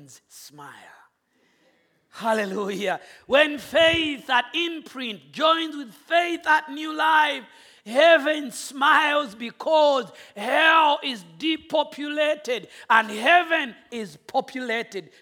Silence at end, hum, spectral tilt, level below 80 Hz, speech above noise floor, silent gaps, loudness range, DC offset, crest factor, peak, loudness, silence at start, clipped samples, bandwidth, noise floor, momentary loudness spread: 0.2 s; none; -3 dB/octave; -64 dBFS; 44 dB; none; 3 LU; under 0.1%; 20 dB; -2 dBFS; -22 LUFS; 0.35 s; under 0.1%; 17.5 kHz; -67 dBFS; 15 LU